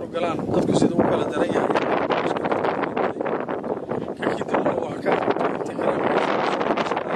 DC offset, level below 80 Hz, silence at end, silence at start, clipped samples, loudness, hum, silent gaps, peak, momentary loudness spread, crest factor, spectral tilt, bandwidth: under 0.1%; -54 dBFS; 0 s; 0 s; under 0.1%; -23 LUFS; none; none; -4 dBFS; 6 LU; 18 dB; -6 dB/octave; 12 kHz